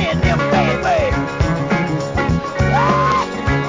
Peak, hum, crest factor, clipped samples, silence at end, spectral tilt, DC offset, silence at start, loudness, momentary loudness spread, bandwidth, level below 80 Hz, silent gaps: -2 dBFS; none; 14 dB; under 0.1%; 0 s; -6.5 dB/octave; 0.2%; 0 s; -17 LUFS; 5 LU; 7.6 kHz; -28 dBFS; none